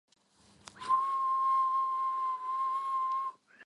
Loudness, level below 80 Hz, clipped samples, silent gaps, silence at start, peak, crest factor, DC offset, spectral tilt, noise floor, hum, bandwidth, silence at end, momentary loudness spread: -31 LUFS; -82 dBFS; under 0.1%; none; 0.75 s; -18 dBFS; 14 dB; under 0.1%; -2 dB/octave; -64 dBFS; none; 11 kHz; 0 s; 6 LU